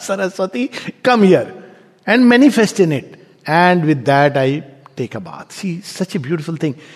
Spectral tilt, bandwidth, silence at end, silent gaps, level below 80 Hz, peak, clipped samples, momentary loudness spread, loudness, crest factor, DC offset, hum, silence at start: -6 dB/octave; 13.5 kHz; 0.2 s; none; -64 dBFS; 0 dBFS; under 0.1%; 16 LU; -15 LUFS; 16 dB; under 0.1%; none; 0 s